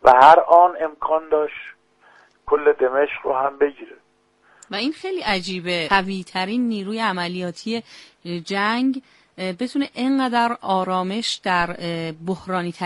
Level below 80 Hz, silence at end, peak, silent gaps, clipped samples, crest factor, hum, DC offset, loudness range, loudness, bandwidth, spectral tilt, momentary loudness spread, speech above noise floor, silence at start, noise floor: -54 dBFS; 0 s; 0 dBFS; none; under 0.1%; 20 dB; none; under 0.1%; 4 LU; -20 LUFS; 11.5 kHz; -5 dB/octave; 13 LU; 39 dB; 0.05 s; -59 dBFS